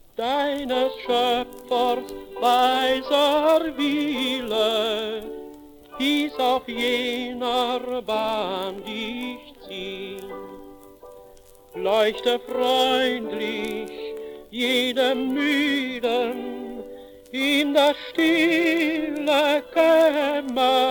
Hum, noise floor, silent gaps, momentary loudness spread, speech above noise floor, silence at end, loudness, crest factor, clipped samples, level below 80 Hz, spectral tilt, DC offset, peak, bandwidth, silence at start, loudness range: none; -49 dBFS; none; 16 LU; 27 dB; 0 s; -22 LUFS; 16 dB; under 0.1%; -56 dBFS; -3 dB/octave; under 0.1%; -6 dBFS; 18 kHz; 0.2 s; 8 LU